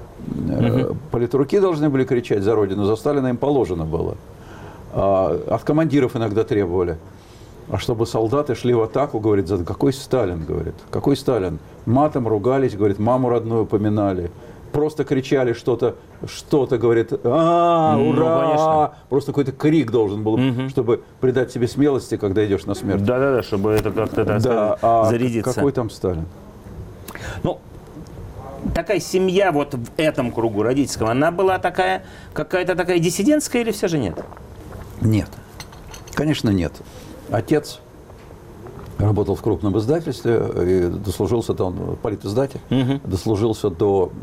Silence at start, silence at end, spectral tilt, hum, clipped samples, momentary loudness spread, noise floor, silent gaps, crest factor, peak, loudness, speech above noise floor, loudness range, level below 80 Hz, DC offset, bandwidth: 0 s; 0 s; -6.5 dB/octave; none; under 0.1%; 16 LU; -41 dBFS; none; 12 dB; -8 dBFS; -20 LUFS; 22 dB; 5 LU; -42 dBFS; under 0.1%; 16 kHz